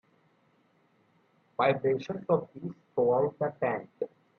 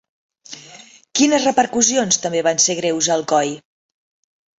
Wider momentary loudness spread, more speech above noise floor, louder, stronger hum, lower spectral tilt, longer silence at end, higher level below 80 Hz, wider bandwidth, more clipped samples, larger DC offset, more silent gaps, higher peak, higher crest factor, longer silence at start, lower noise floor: second, 14 LU vs 21 LU; first, 39 dB vs 27 dB; second, -30 LUFS vs -17 LUFS; neither; first, -8 dB/octave vs -2 dB/octave; second, 0.3 s vs 1 s; second, -72 dBFS vs -62 dBFS; second, 6.6 kHz vs 8.4 kHz; neither; neither; neither; second, -12 dBFS vs 0 dBFS; about the same, 20 dB vs 20 dB; first, 1.6 s vs 0.5 s; first, -68 dBFS vs -44 dBFS